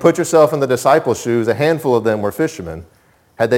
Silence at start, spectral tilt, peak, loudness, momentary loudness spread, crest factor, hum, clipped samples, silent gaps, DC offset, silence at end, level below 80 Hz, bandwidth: 0 s; -5.5 dB/octave; 0 dBFS; -15 LUFS; 10 LU; 16 dB; none; under 0.1%; none; under 0.1%; 0 s; -50 dBFS; 17 kHz